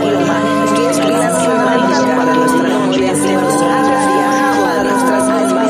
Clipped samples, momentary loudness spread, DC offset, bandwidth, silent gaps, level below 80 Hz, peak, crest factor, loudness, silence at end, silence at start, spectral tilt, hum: under 0.1%; 1 LU; under 0.1%; 15.5 kHz; none; -54 dBFS; -2 dBFS; 10 dB; -12 LUFS; 0 s; 0 s; -4.5 dB/octave; none